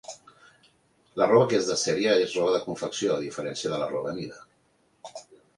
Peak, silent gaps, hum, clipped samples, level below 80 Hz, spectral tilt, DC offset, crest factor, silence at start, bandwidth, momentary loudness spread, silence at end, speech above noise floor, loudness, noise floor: -8 dBFS; none; none; under 0.1%; -66 dBFS; -4 dB/octave; under 0.1%; 20 dB; 0.1 s; 11.5 kHz; 23 LU; 0.2 s; 41 dB; -25 LUFS; -66 dBFS